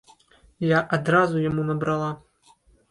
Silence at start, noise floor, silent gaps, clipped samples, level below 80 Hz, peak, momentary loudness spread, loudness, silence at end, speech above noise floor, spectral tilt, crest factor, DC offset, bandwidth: 0.6 s; -58 dBFS; none; under 0.1%; -56 dBFS; -6 dBFS; 9 LU; -23 LUFS; 0.75 s; 36 dB; -7.5 dB/octave; 18 dB; under 0.1%; 11 kHz